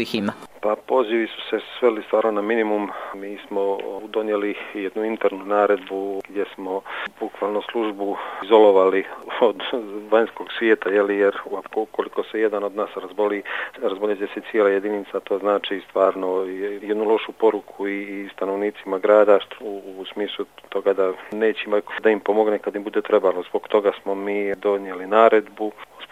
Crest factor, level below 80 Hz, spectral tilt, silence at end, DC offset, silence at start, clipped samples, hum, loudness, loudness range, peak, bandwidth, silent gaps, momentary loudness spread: 22 dB; -70 dBFS; -6 dB/octave; 0.05 s; under 0.1%; 0 s; under 0.1%; none; -22 LUFS; 4 LU; 0 dBFS; 13.5 kHz; none; 11 LU